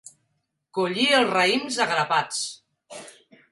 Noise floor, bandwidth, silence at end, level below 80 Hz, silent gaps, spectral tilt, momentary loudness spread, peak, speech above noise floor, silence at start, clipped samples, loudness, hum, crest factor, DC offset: -75 dBFS; 11.5 kHz; 0.4 s; -74 dBFS; none; -2.5 dB/octave; 23 LU; -6 dBFS; 52 dB; 0.75 s; under 0.1%; -22 LUFS; none; 18 dB; under 0.1%